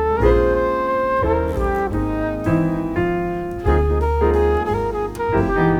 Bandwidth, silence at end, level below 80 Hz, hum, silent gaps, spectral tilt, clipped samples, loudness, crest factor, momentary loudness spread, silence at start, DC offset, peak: 13.5 kHz; 0 s; -26 dBFS; none; none; -8.5 dB/octave; under 0.1%; -19 LUFS; 16 dB; 6 LU; 0 s; under 0.1%; -2 dBFS